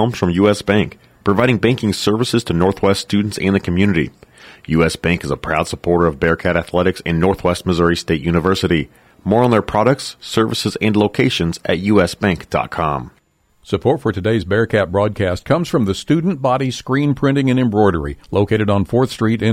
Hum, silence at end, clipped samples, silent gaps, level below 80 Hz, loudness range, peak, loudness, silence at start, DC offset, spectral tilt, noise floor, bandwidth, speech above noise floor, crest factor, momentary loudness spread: none; 0 s; under 0.1%; none; -38 dBFS; 2 LU; -2 dBFS; -17 LUFS; 0 s; under 0.1%; -6 dB/octave; -55 dBFS; 16 kHz; 39 dB; 16 dB; 5 LU